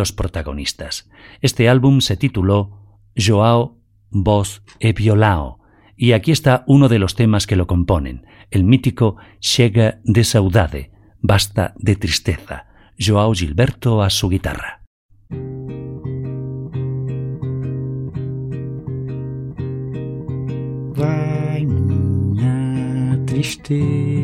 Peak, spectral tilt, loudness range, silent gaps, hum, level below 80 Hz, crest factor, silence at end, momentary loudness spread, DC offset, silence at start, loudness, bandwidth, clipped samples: -2 dBFS; -6 dB/octave; 10 LU; 14.87-15.09 s; none; -36 dBFS; 16 dB; 0 s; 13 LU; under 0.1%; 0 s; -18 LUFS; 16 kHz; under 0.1%